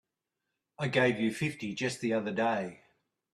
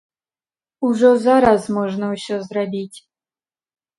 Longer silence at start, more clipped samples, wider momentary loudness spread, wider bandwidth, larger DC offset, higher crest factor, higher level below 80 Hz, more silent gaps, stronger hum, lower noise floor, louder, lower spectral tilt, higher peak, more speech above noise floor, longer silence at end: about the same, 0.8 s vs 0.8 s; neither; second, 8 LU vs 12 LU; first, 13 kHz vs 11.5 kHz; neither; about the same, 20 dB vs 18 dB; second, -70 dBFS vs -54 dBFS; neither; neither; second, -86 dBFS vs under -90 dBFS; second, -31 LUFS vs -17 LUFS; about the same, -5.5 dB/octave vs -6 dB/octave; second, -14 dBFS vs -2 dBFS; second, 55 dB vs over 73 dB; second, 0.6 s vs 1 s